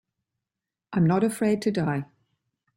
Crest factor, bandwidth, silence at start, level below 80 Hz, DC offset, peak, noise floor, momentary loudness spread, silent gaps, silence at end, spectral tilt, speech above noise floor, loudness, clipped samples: 16 dB; 16 kHz; 0.9 s; -64 dBFS; under 0.1%; -10 dBFS; -88 dBFS; 10 LU; none; 0.75 s; -7 dB/octave; 65 dB; -25 LUFS; under 0.1%